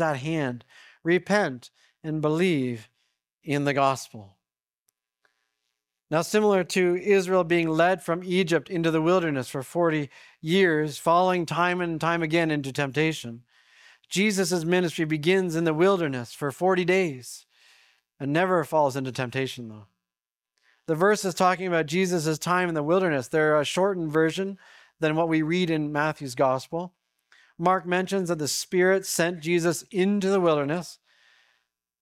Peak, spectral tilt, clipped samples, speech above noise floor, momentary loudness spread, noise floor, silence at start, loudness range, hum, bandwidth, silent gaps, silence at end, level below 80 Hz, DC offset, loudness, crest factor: -8 dBFS; -5 dB/octave; under 0.1%; over 66 dB; 10 LU; under -90 dBFS; 0 s; 4 LU; none; 16 kHz; 3.33-3.37 s, 4.79-4.86 s; 1.05 s; -66 dBFS; under 0.1%; -25 LUFS; 18 dB